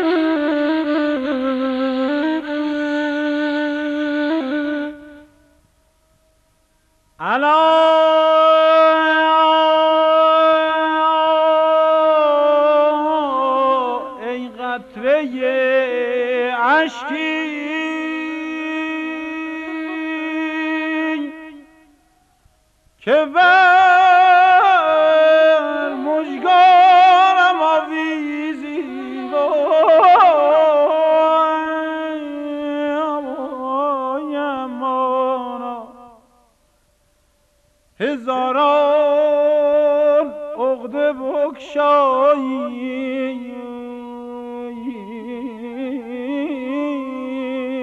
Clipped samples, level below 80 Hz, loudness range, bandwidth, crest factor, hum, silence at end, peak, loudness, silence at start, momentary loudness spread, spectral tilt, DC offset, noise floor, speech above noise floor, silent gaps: under 0.1%; -62 dBFS; 12 LU; 7.6 kHz; 14 dB; none; 0 s; -2 dBFS; -16 LUFS; 0 s; 15 LU; -4 dB/octave; under 0.1%; -60 dBFS; 47 dB; none